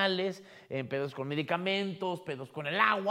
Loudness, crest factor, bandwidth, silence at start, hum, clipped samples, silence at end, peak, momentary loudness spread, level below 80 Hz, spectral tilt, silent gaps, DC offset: -33 LUFS; 22 dB; 15 kHz; 0 s; none; under 0.1%; 0 s; -10 dBFS; 12 LU; -82 dBFS; -5.5 dB/octave; none; under 0.1%